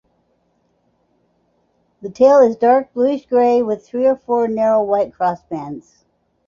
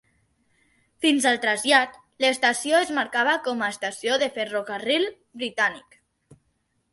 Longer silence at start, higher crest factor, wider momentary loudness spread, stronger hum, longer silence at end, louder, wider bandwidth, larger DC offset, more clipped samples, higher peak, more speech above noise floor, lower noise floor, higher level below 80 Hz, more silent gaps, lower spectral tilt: first, 2.05 s vs 1 s; about the same, 16 dB vs 20 dB; first, 16 LU vs 9 LU; neither; second, 0.65 s vs 1.15 s; first, -16 LUFS vs -23 LUFS; second, 7.2 kHz vs 12 kHz; neither; neither; about the same, -2 dBFS vs -4 dBFS; about the same, 48 dB vs 48 dB; second, -63 dBFS vs -72 dBFS; first, -60 dBFS vs -72 dBFS; neither; first, -7 dB/octave vs -1.5 dB/octave